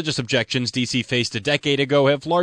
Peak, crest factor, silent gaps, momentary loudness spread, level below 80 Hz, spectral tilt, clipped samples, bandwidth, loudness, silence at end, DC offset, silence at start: -2 dBFS; 18 dB; none; 4 LU; -56 dBFS; -4.5 dB/octave; under 0.1%; 10.5 kHz; -20 LUFS; 0 s; under 0.1%; 0 s